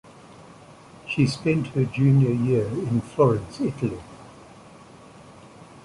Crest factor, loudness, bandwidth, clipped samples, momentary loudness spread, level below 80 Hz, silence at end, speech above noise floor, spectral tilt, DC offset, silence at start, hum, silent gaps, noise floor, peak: 18 dB; -23 LUFS; 11.5 kHz; under 0.1%; 16 LU; -52 dBFS; 0.05 s; 25 dB; -8 dB/octave; under 0.1%; 0.3 s; none; none; -47 dBFS; -6 dBFS